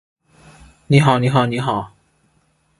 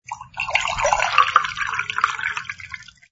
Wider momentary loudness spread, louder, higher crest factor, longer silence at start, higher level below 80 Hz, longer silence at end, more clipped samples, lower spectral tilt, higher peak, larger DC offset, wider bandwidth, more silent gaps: second, 11 LU vs 17 LU; first, -16 LUFS vs -20 LUFS; about the same, 20 dB vs 22 dB; first, 0.9 s vs 0.1 s; about the same, -50 dBFS vs -48 dBFS; first, 0.9 s vs 0.3 s; neither; first, -7 dB/octave vs -0.5 dB/octave; about the same, 0 dBFS vs 0 dBFS; neither; first, 11.5 kHz vs 8 kHz; neither